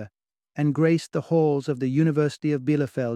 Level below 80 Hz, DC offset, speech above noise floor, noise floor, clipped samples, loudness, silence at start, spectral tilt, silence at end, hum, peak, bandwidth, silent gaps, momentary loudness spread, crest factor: -66 dBFS; under 0.1%; 41 dB; -63 dBFS; under 0.1%; -23 LUFS; 0 s; -8 dB/octave; 0 s; none; -8 dBFS; 11 kHz; none; 5 LU; 14 dB